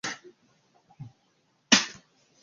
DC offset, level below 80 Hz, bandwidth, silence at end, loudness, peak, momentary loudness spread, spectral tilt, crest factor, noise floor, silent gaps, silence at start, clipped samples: under 0.1%; -68 dBFS; 7.4 kHz; 0.5 s; -24 LUFS; -2 dBFS; 27 LU; -0.5 dB/octave; 30 dB; -70 dBFS; none; 0.05 s; under 0.1%